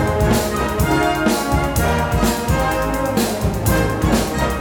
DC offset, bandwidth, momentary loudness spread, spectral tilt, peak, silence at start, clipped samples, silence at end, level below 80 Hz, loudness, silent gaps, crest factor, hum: under 0.1%; 19.5 kHz; 3 LU; -5 dB/octave; -4 dBFS; 0 s; under 0.1%; 0 s; -26 dBFS; -18 LUFS; none; 14 dB; none